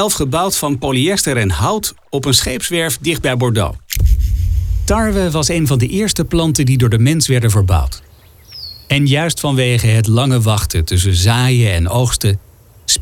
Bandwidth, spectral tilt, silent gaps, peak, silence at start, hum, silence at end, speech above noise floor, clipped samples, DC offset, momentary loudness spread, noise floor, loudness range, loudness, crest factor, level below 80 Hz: 18 kHz; -4.5 dB/octave; none; 0 dBFS; 0 s; none; 0 s; 26 dB; under 0.1%; under 0.1%; 6 LU; -39 dBFS; 2 LU; -14 LUFS; 14 dB; -24 dBFS